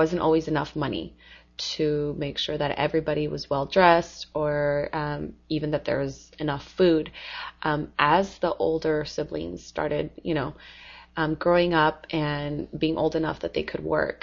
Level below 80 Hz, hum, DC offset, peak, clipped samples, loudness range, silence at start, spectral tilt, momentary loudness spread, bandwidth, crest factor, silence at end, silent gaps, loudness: -48 dBFS; none; under 0.1%; -4 dBFS; under 0.1%; 3 LU; 0 s; -6 dB/octave; 12 LU; 7.4 kHz; 22 dB; 0.05 s; none; -26 LUFS